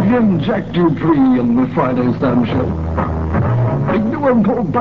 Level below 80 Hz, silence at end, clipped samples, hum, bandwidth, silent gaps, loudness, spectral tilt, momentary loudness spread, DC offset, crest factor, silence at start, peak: -32 dBFS; 0 s; under 0.1%; none; 6 kHz; none; -15 LUFS; -10 dB/octave; 5 LU; 0.8%; 12 dB; 0 s; -2 dBFS